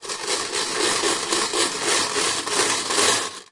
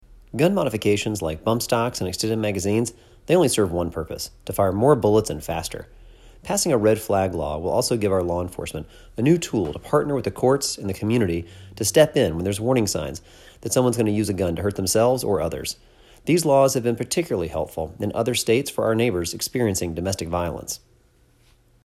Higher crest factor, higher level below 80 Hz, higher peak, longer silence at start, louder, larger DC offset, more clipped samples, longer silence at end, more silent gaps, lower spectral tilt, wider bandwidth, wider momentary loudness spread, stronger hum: about the same, 18 dB vs 20 dB; second, -62 dBFS vs -48 dBFS; second, -6 dBFS vs -2 dBFS; second, 0 s vs 0.35 s; about the same, -20 LUFS vs -22 LUFS; neither; neither; second, 0.1 s vs 1.1 s; neither; second, 0 dB/octave vs -5 dB/octave; second, 11.5 kHz vs 16 kHz; second, 5 LU vs 12 LU; neither